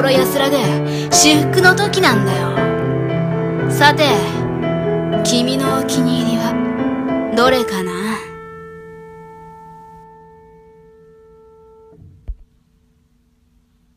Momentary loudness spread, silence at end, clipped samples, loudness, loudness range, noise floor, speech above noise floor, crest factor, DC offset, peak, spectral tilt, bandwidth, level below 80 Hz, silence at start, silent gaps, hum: 23 LU; 1.55 s; under 0.1%; -15 LUFS; 8 LU; -57 dBFS; 43 dB; 18 dB; under 0.1%; 0 dBFS; -4 dB/octave; 15.5 kHz; -44 dBFS; 0 s; none; none